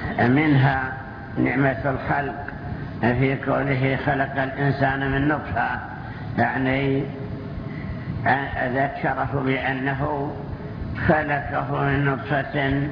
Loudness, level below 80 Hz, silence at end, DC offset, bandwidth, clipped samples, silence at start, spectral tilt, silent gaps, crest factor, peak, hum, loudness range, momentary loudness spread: -23 LUFS; -40 dBFS; 0 s; under 0.1%; 5.4 kHz; under 0.1%; 0 s; -9.5 dB/octave; none; 18 dB; -4 dBFS; none; 2 LU; 12 LU